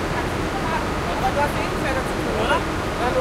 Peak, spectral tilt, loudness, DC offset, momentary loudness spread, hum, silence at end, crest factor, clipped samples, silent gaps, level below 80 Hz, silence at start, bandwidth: -6 dBFS; -5 dB/octave; -23 LUFS; under 0.1%; 3 LU; none; 0 s; 16 dB; under 0.1%; none; -34 dBFS; 0 s; 16 kHz